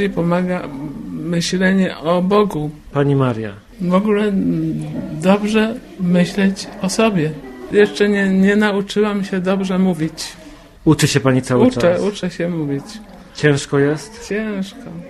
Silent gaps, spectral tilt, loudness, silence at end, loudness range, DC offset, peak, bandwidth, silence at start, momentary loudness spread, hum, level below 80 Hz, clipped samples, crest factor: none; -6 dB/octave; -17 LUFS; 0 s; 2 LU; under 0.1%; 0 dBFS; 13 kHz; 0 s; 12 LU; none; -46 dBFS; under 0.1%; 16 dB